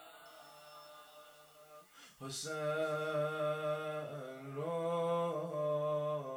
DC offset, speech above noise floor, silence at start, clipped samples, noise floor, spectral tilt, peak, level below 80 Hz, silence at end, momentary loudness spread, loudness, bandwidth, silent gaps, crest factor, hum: under 0.1%; 22 dB; 0 s; under 0.1%; -59 dBFS; -5 dB/octave; -26 dBFS; -86 dBFS; 0 s; 22 LU; -38 LUFS; over 20 kHz; none; 14 dB; none